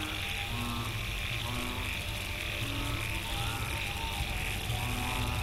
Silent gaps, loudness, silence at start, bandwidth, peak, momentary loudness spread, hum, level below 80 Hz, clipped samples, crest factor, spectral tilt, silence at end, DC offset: none; -34 LUFS; 0 s; 16 kHz; -20 dBFS; 2 LU; none; -40 dBFS; under 0.1%; 14 dB; -3.5 dB/octave; 0 s; under 0.1%